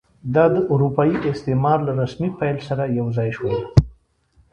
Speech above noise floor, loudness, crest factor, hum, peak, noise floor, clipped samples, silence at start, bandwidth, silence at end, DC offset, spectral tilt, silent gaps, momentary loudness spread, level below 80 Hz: 40 dB; -20 LUFS; 20 dB; none; 0 dBFS; -58 dBFS; under 0.1%; 0.25 s; 7.6 kHz; 0.6 s; under 0.1%; -9 dB/octave; none; 7 LU; -38 dBFS